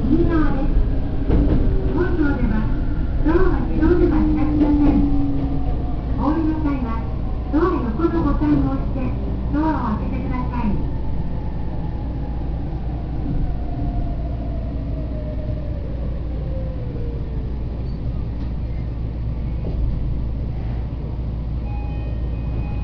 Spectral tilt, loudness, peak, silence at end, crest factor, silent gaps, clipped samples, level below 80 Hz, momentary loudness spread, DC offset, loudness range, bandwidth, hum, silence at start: -10.5 dB/octave; -23 LUFS; -4 dBFS; 0 s; 16 dB; none; under 0.1%; -22 dBFS; 9 LU; under 0.1%; 8 LU; 5.4 kHz; none; 0 s